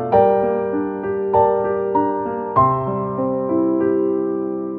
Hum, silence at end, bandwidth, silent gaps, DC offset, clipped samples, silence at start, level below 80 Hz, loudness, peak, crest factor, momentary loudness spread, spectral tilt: none; 0 s; 4.3 kHz; none; under 0.1%; under 0.1%; 0 s; -50 dBFS; -19 LUFS; -2 dBFS; 16 dB; 7 LU; -11.5 dB/octave